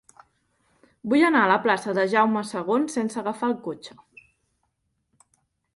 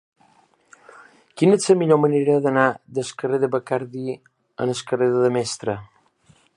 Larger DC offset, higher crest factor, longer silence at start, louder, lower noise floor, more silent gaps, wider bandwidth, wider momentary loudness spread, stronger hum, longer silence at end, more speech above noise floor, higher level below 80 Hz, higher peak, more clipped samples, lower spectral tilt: neither; about the same, 20 dB vs 20 dB; second, 1.05 s vs 1.35 s; about the same, -23 LUFS vs -21 LUFS; first, -74 dBFS vs -58 dBFS; neither; about the same, 11.5 kHz vs 11.5 kHz; first, 16 LU vs 13 LU; neither; first, 1.85 s vs 0.7 s; first, 51 dB vs 39 dB; second, -72 dBFS vs -66 dBFS; second, -6 dBFS vs -2 dBFS; neither; about the same, -5 dB/octave vs -5.5 dB/octave